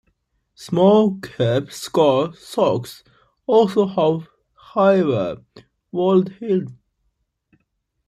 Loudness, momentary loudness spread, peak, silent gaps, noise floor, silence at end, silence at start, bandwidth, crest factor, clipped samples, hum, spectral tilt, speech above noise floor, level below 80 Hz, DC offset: -19 LUFS; 12 LU; -2 dBFS; none; -72 dBFS; 1.35 s; 0.6 s; 14.5 kHz; 18 dB; under 0.1%; none; -7 dB/octave; 54 dB; -60 dBFS; under 0.1%